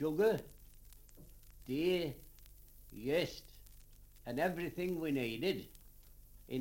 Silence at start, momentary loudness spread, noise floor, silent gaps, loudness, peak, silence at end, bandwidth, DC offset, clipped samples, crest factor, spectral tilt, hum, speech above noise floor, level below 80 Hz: 0 s; 25 LU; -58 dBFS; none; -38 LUFS; -20 dBFS; 0 s; 17 kHz; under 0.1%; under 0.1%; 18 dB; -6 dB/octave; none; 22 dB; -60 dBFS